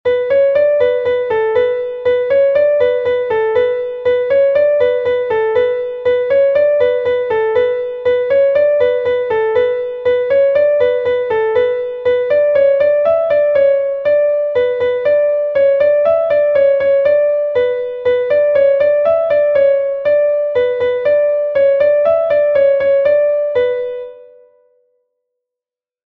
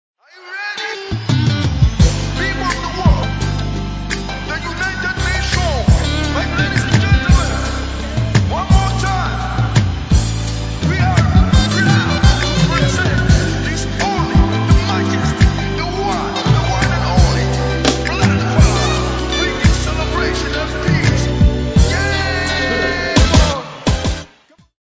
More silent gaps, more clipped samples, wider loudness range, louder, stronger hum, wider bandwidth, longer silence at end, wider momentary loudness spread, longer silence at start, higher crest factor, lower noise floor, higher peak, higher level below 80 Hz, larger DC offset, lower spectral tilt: neither; neither; about the same, 2 LU vs 3 LU; first, -13 LUFS vs -16 LUFS; neither; second, 4.5 kHz vs 8 kHz; first, 1.85 s vs 0.6 s; second, 5 LU vs 8 LU; second, 0.05 s vs 0.4 s; about the same, 10 dB vs 14 dB; first, -88 dBFS vs -49 dBFS; about the same, -2 dBFS vs 0 dBFS; second, -52 dBFS vs -20 dBFS; neither; about the same, -6 dB/octave vs -5 dB/octave